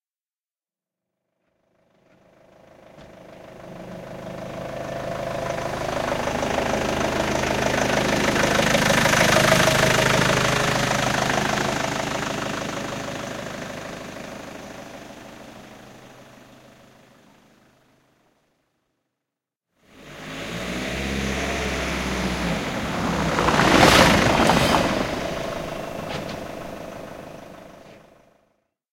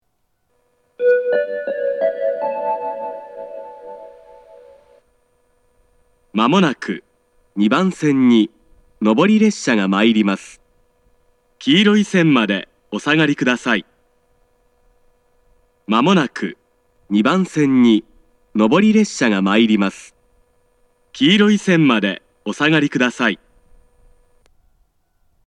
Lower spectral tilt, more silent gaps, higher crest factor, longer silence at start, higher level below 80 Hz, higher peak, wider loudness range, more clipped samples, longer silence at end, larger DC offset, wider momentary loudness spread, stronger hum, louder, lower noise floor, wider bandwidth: second, -4 dB/octave vs -5.5 dB/octave; neither; first, 24 dB vs 18 dB; first, 2.95 s vs 1 s; first, -42 dBFS vs -60 dBFS; about the same, -2 dBFS vs 0 dBFS; first, 19 LU vs 7 LU; neither; second, 0.95 s vs 2.1 s; neither; first, 22 LU vs 15 LU; neither; second, -21 LUFS vs -16 LUFS; first, under -90 dBFS vs -69 dBFS; first, 16.5 kHz vs 10.5 kHz